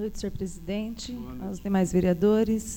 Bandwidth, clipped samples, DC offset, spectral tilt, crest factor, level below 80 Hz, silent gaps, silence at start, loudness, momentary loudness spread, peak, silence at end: 17.5 kHz; under 0.1%; under 0.1%; -6.5 dB/octave; 16 dB; -44 dBFS; none; 0 s; -27 LUFS; 14 LU; -10 dBFS; 0 s